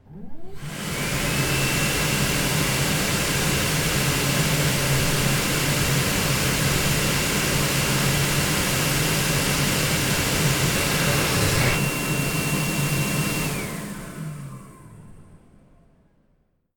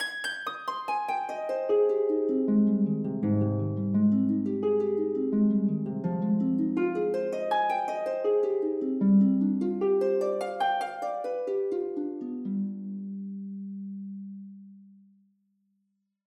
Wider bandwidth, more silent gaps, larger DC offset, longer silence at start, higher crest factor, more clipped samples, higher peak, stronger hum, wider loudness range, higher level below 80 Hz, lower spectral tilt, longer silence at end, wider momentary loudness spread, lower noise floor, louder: first, 19 kHz vs 10 kHz; neither; neither; about the same, 0.1 s vs 0 s; about the same, 16 dB vs 14 dB; neither; first, -8 dBFS vs -14 dBFS; neither; second, 6 LU vs 10 LU; first, -38 dBFS vs -72 dBFS; second, -3.5 dB/octave vs -8 dB/octave; about the same, 1.4 s vs 1.4 s; second, 9 LU vs 13 LU; second, -65 dBFS vs -77 dBFS; first, -21 LUFS vs -28 LUFS